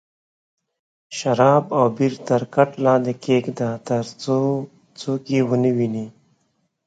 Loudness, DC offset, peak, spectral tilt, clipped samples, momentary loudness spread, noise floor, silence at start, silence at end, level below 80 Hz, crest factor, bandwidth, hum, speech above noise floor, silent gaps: -20 LUFS; under 0.1%; 0 dBFS; -7 dB/octave; under 0.1%; 11 LU; -69 dBFS; 1.1 s; 0.75 s; -66 dBFS; 20 dB; 9.2 kHz; none; 49 dB; none